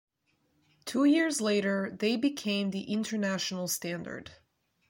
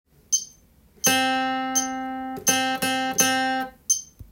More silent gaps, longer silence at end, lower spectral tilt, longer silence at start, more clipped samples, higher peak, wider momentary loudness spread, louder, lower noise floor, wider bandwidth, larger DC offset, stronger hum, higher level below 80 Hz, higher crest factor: neither; first, 0.55 s vs 0.05 s; first, -4 dB/octave vs -1 dB/octave; first, 0.85 s vs 0.3 s; neither; second, -16 dBFS vs -6 dBFS; first, 12 LU vs 9 LU; second, -30 LUFS vs -23 LUFS; first, -74 dBFS vs -55 dBFS; about the same, 16.5 kHz vs 17 kHz; neither; neither; second, -72 dBFS vs -58 dBFS; about the same, 16 dB vs 18 dB